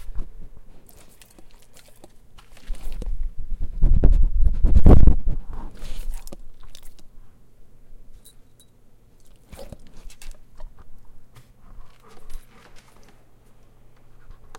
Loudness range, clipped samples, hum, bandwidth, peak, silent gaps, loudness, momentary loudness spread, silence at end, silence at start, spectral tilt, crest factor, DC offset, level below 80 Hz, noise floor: 23 LU; under 0.1%; none; 4.1 kHz; 0 dBFS; none; -22 LUFS; 30 LU; 0.05 s; 0 s; -8.5 dB/octave; 20 dB; under 0.1%; -24 dBFS; -50 dBFS